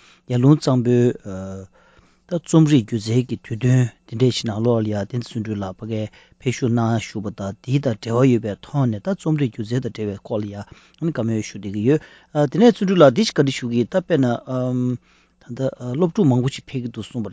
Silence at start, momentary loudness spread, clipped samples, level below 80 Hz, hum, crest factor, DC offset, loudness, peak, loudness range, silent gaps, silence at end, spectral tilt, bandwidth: 0.3 s; 13 LU; under 0.1%; -52 dBFS; none; 20 dB; under 0.1%; -20 LUFS; 0 dBFS; 6 LU; none; 0 s; -7 dB/octave; 8 kHz